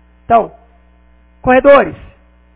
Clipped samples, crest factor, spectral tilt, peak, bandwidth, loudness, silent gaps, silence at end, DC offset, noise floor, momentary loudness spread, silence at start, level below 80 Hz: 0.3%; 14 dB; -9.5 dB/octave; 0 dBFS; 4 kHz; -11 LUFS; none; 0.6 s; under 0.1%; -47 dBFS; 14 LU; 0.3 s; -38 dBFS